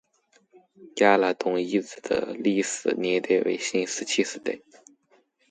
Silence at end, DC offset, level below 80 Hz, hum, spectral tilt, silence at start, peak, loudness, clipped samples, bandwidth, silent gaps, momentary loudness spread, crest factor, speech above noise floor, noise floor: 0.9 s; under 0.1%; -70 dBFS; none; -3.5 dB/octave; 0.8 s; -4 dBFS; -25 LUFS; under 0.1%; 9.6 kHz; none; 9 LU; 22 dB; 40 dB; -65 dBFS